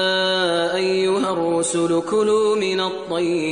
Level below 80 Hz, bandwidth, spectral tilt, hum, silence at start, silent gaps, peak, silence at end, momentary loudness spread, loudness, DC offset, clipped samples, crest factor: -62 dBFS; 10.5 kHz; -3.5 dB/octave; none; 0 s; none; -8 dBFS; 0 s; 4 LU; -20 LUFS; 0.1%; under 0.1%; 12 dB